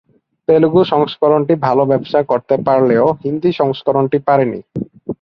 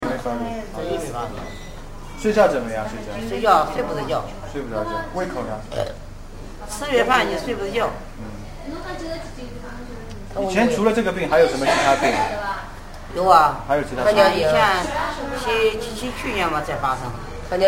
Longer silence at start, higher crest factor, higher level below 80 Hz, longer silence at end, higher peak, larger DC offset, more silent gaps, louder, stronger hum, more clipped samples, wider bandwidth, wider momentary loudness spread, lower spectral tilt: first, 0.5 s vs 0 s; second, 14 dB vs 20 dB; second, -54 dBFS vs -36 dBFS; about the same, 0.1 s vs 0 s; about the same, 0 dBFS vs 0 dBFS; second, under 0.1% vs 0.1%; neither; first, -14 LUFS vs -21 LUFS; neither; neither; second, 6 kHz vs 16.5 kHz; second, 9 LU vs 19 LU; first, -9.5 dB/octave vs -4.5 dB/octave